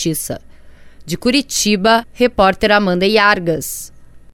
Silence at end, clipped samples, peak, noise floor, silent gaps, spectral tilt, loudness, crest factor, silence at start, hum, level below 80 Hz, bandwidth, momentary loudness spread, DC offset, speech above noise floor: 0.15 s; under 0.1%; 0 dBFS; -38 dBFS; none; -3.5 dB/octave; -14 LUFS; 16 dB; 0 s; none; -40 dBFS; 18 kHz; 14 LU; under 0.1%; 23 dB